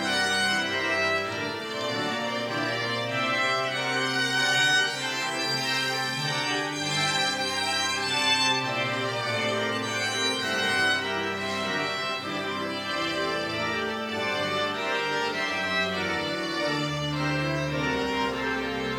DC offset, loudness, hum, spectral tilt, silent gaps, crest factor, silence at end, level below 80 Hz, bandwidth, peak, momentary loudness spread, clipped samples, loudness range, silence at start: under 0.1%; -26 LUFS; none; -3 dB/octave; none; 16 dB; 0 s; -58 dBFS; 17 kHz; -12 dBFS; 6 LU; under 0.1%; 3 LU; 0 s